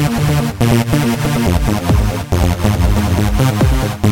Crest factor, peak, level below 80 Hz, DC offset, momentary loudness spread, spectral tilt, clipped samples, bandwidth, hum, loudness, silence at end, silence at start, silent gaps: 12 dB; -2 dBFS; -20 dBFS; 0.7%; 2 LU; -6 dB/octave; under 0.1%; 17.5 kHz; none; -15 LUFS; 0 s; 0 s; none